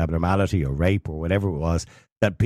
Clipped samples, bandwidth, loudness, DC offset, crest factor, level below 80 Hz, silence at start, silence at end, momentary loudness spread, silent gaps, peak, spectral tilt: under 0.1%; 12.5 kHz; -24 LUFS; under 0.1%; 16 dB; -36 dBFS; 0 s; 0 s; 4 LU; 2.12-2.16 s; -6 dBFS; -7 dB/octave